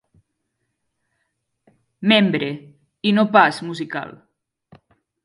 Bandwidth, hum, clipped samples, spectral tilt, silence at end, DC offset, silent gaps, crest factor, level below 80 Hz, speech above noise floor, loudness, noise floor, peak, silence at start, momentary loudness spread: 11 kHz; none; under 0.1%; -6 dB/octave; 1.1 s; under 0.1%; none; 22 dB; -68 dBFS; 57 dB; -18 LUFS; -75 dBFS; 0 dBFS; 2 s; 15 LU